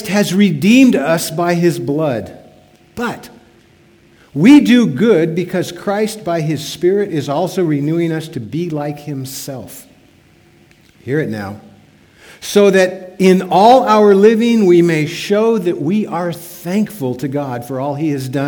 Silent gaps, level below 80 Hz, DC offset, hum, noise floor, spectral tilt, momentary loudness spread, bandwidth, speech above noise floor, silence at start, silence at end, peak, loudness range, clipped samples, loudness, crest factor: none; -56 dBFS; under 0.1%; none; -48 dBFS; -6 dB/octave; 16 LU; over 20 kHz; 35 dB; 0 s; 0 s; 0 dBFS; 13 LU; 0.1%; -14 LUFS; 14 dB